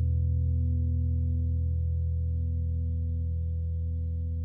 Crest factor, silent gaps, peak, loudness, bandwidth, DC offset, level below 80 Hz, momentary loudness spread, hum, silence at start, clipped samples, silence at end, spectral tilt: 8 dB; none; -20 dBFS; -30 LUFS; 0.5 kHz; under 0.1%; -32 dBFS; 4 LU; none; 0 s; under 0.1%; 0 s; -15.5 dB/octave